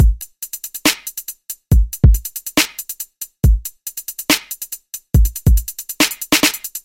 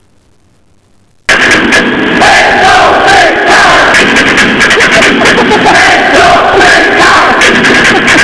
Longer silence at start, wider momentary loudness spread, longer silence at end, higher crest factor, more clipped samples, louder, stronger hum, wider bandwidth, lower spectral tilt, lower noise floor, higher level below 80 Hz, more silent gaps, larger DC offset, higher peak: second, 0 s vs 1.3 s; first, 14 LU vs 2 LU; about the same, 0.05 s vs 0 s; first, 16 dB vs 4 dB; neither; second, -18 LUFS vs -3 LUFS; neither; first, 17 kHz vs 11 kHz; about the same, -3.5 dB/octave vs -2.5 dB/octave; second, -33 dBFS vs -47 dBFS; first, -20 dBFS vs -30 dBFS; neither; second, under 0.1% vs 1%; about the same, 0 dBFS vs 0 dBFS